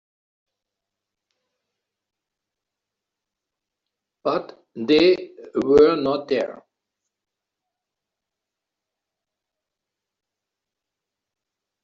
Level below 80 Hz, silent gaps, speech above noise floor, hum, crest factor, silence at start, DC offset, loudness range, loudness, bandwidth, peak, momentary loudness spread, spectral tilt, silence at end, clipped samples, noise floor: -60 dBFS; none; 67 dB; none; 22 dB; 4.25 s; under 0.1%; 13 LU; -20 LUFS; 7.2 kHz; -4 dBFS; 15 LU; -3.5 dB/octave; 5.3 s; under 0.1%; -85 dBFS